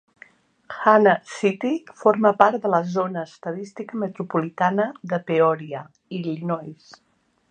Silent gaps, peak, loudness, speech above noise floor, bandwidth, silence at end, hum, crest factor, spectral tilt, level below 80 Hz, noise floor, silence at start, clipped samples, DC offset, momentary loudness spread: none; 0 dBFS; -22 LUFS; 30 dB; 9.4 kHz; 0.75 s; none; 22 dB; -7 dB/octave; -72 dBFS; -52 dBFS; 0.7 s; under 0.1%; under 0.1%; 15 LU